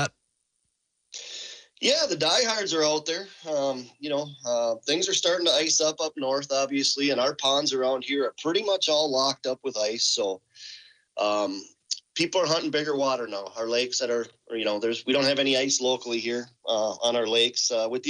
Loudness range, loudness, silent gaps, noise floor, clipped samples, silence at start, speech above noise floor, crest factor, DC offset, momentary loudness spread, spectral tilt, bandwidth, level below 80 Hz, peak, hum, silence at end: 3 LU; -25 LUFS; none; -76 dBFS; under 0.1%; 0 s; 51 dB; 16 dB; under 0.1%; 11 LU; -2 dB/octave; 10 kHz; -78 dBFS; -10 dBFS; none; 0 s